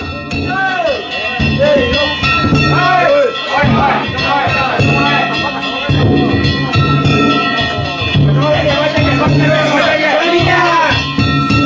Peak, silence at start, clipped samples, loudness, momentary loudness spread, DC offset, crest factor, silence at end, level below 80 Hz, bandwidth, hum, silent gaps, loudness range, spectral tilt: -2 dBFS; 0 s; under 0.1%; -11 LUFS; 5 LU; under 0.1%; 10 dB; 0 s; -28 dBFS; 7.6 kHz; none; none; 1 LU; -6 dB/octave